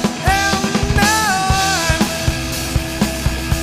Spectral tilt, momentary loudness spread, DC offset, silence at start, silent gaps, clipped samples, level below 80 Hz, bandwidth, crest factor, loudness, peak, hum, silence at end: -3.5 dB/octave; 6 LU; under 0.1%; 0 s; none; under 0.1%; -26 dBFS; 15.5 kHz; 16 dB; -16 LUFS; 0 dBFS; none; 0 s